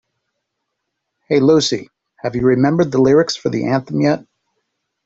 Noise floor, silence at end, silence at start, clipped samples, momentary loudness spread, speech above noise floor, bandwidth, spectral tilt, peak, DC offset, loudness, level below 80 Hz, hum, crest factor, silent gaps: -76 dBFS; 0.85 s; 1.3 s; under 0.1%; 11 LU; 61 dB; 8 kHz; -6 dB/octave; -2 dBFS; under 0.1%; -16 LUFS; -52 dBFS; none; 16 dB; none